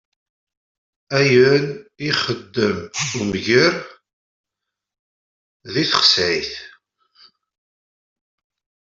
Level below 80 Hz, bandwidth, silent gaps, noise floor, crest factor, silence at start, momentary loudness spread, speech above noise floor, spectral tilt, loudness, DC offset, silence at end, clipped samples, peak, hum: -58 dBFS; 7.8 kHz; 4.13-4.44 s, 4.99-5.60 s; -83 dBFS; 20 dB; 1.1 s; 14 LU; 65 dB; -4 dB/octave; -17 LUFS; under 0.1%; 2.2 s; under 0.1%; -2 dBFS; none